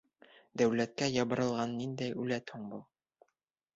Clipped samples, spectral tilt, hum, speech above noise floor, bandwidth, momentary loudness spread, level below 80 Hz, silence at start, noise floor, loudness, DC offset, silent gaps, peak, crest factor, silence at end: under 0.1%; -5 dB/octave; none; 50 dB; 8 kHz; 15 LU; -72 dBFS; 0.55 s; -84 dBFS; -34 LUFS; under 0.1%; none; -16 dBFS; 20 dB; 0.95 s